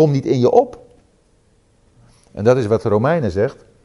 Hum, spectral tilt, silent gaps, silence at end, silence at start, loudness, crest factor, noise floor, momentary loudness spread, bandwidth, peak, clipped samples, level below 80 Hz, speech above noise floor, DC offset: none; -8 dB/octave; none; 0.3 s; 0 s; -17 LUFS; 18 dB; -56 dBFS; 9 LU; 11.5 kHz; 0 dBFS; under 0.1%; -52 dBFS; 41 dB; under 0.1%